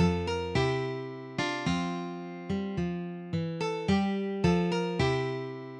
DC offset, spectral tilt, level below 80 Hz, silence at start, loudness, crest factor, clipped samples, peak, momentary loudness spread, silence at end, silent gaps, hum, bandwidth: under 0.1%; -6.5 dB/octave; -50 dBFS; 0 s; -31 LUFS; 16 dB; under 0.1%; -14 dBFS; 9 LU; 0 s; none; none; 9.8 kHz